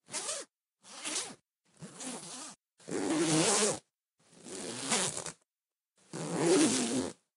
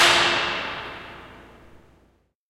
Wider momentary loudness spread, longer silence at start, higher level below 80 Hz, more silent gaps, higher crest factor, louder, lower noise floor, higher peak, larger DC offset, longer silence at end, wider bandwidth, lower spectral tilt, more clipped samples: second, 21 LU vs 25 LU; about the same, 0.1 s vs 0 s; second, -76 dBFS vs -54 dBFS; neither; about the same, 24 dB vs 22 dB; second, -32 LUFS vs -21 LUFS; first, under -90 dBFS vs -62 dBFS; second, -12 dBFS vs -4 dBFS; neither; second, 0.25 s vs 0.75 s; about the same, 15 kHz vs 16.5 kHz; first, -3 dB/octave vs -1 dB/octave; neither